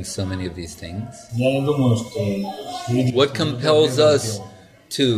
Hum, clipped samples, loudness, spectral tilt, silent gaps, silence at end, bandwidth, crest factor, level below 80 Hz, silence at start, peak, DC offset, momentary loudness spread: none; under 0.1%; -20 LUFS; -5.5 dB/octave; none; 0 s; 15 kHz; 16 dB; -52 dBFS; 0 s; -4 dBFS; under 0.1%; 15 LU